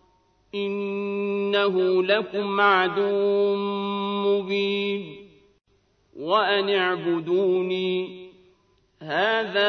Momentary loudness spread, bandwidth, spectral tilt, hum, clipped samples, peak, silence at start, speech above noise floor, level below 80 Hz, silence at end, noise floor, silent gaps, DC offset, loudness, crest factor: 9 LU; 6.2 kHz; -6.5 dB/octave; none; under 0.1%; -6 dBFS; 0.55 s; 41 dB; -70 dBFS; 0 s; -63 dBFS; none; under 0.1%; -23 LUFS; 18 dB